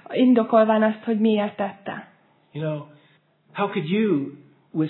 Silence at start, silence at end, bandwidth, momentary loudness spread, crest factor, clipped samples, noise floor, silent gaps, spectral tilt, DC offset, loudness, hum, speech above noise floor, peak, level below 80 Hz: 0.1 s; 0 s; 4.2 kHz; 18 LU; 18 dB; under 0.1%; -60 dBFS; none; -11 dB/octave; under 0.1%; -22 LUFS; none; 39 dB; -4 dBFS; -82 dBFS